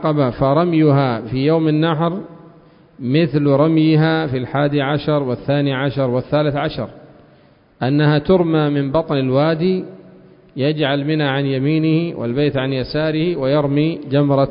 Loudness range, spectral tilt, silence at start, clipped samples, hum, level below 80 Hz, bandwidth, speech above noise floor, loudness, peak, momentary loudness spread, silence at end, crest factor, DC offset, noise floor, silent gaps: 2 LU; -12.5 dB/octave; 0 s; under 0.1%; none; -46 dBFS; 5.4 kHz; 34 dB; -17 LUFS; -2 dBFS; 7 LU; 0 s; 14 dB; under 0.1%; -50 dBFS; none